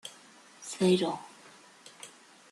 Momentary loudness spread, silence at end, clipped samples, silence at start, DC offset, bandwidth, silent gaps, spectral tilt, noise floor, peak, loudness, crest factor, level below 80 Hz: 26 LU; 0.45 s; under 0.1%; 0.05 s; under 0.1%; 12.5 kHz; none; -5 dB/octave; -56 dBFS; -14 dBFS; -29 LUFS; 20 dB; -76 dBFS